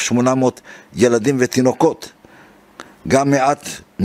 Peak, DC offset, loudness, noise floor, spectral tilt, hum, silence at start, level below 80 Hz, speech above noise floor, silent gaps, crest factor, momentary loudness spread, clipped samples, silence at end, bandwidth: 0 dBFS; under 0.1%; -16 LUFS; -46 dBFS; -5 dB/octave; none; 0 s; -52 dBFS; 30 dB; none; 16 dB; 17 LU; under 0.1%; 0 s; 15.5 kHz